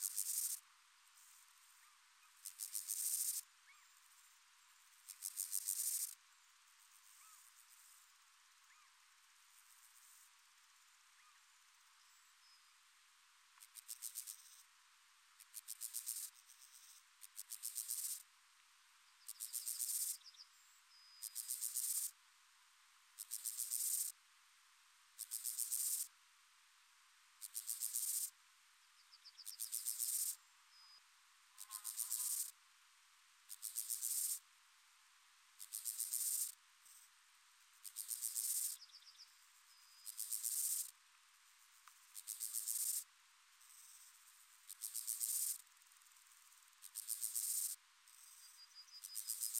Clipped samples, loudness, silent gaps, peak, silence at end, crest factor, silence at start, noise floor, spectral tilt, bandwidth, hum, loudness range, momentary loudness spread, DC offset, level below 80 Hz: under 0.1%; -42 LUFS; none; -24 dBFS; 0 s; 24 dB; 0 s; -70 dBFS; 8.5 dB/octave; 16 kHz; none; 12 LU; 25 LU; under 0.1%; under -90 dBFS